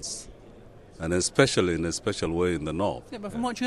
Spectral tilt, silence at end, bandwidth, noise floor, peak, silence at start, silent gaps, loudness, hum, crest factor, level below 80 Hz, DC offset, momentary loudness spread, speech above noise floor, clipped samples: -4.5 dB/octave; 0 s; 12.5 kHz; -48 dBFS; -6 dBFS; 0 s; none; -27 LUFS; none; 22 dB; -48 dBFS; under 0.1%; 14 LU; 22 dB; under 0.1%